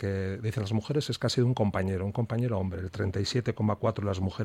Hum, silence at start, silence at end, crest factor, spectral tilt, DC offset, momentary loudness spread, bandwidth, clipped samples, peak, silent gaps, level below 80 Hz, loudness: none; 0 s; 0 s; 16 dB; -6.5 dB/octave; under 0.1%; 6 LU; 13 kHz; under 0.1%; -12 dBFS; none; -56 dBFS; -30 LUFS